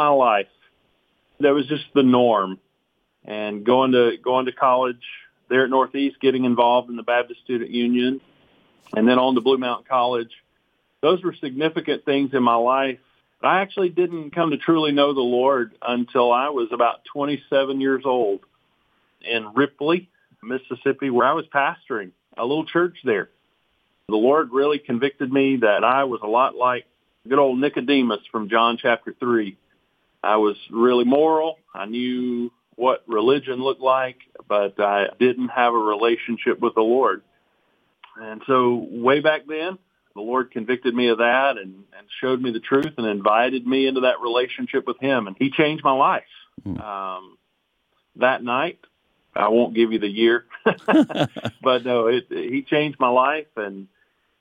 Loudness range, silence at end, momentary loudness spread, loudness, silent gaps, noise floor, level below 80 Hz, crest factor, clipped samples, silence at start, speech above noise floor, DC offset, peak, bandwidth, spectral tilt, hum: 3 LU; 0.55 s; 11 LU; -21 LUFS; none; -71 dBFS; -70 dBFS; 18 dB; under 0.1%; 0 s; 51 dB; under 0.1%; -4 dBFS; 7.4 kHz; -7 dB/octave; none